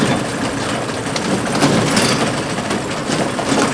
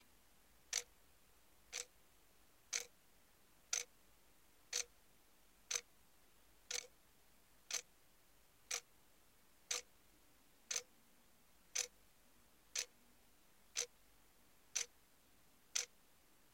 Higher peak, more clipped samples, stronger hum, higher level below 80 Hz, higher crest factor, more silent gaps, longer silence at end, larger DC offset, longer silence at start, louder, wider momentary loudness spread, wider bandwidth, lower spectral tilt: first, 0 dBFS vs -22 dBFS; neither; neither; first, -44 dBFS vs -80 dBFS; second, 18 dB vs 30 dB; neither; second, 0 s vs 0.7 s; neither; second, 0 s vs 0.7 s; first, -17 LUFS vs -45 LUFS; about the same, 6 LU vs 8 LU; second, 11 kHz vs 16.5 kHz; first, -4 dB/octave vs 2 dB/octave